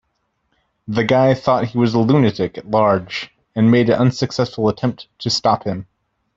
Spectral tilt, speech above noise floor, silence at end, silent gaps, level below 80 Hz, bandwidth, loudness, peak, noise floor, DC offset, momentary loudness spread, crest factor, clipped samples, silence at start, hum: -6.5 dB/octave; 53 dB; 0.55 s; none; -52 dBFS; 7.8 kHz; -17 LUFS; -2 dBFS; -69 dBFS; under 0.1%; 12 LU; 16 dB; under 0.1%; 0.9 s; none